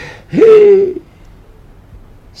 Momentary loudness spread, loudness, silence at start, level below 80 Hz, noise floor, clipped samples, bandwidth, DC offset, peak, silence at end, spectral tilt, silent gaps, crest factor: 15 LU; -8 LUFS; 0 s; -42 dBFS; -39 dBFS; under 0.1%; 6.6 kHz; under 0.1%; 0 dBFS; 1.4 s; -7.5 dB/octave; none; 12 dB